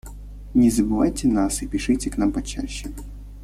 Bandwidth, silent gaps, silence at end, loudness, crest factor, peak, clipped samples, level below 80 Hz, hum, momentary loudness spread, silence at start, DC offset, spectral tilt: 15 kHz; none; 0 s; -22 LUFS; 16 dB; -8 dBFS; under 0.1%; -34 dBFS; 50 Hz at -35 dBFS; 20 LU; 0.05 s; under 0.1%; -5 dB/octave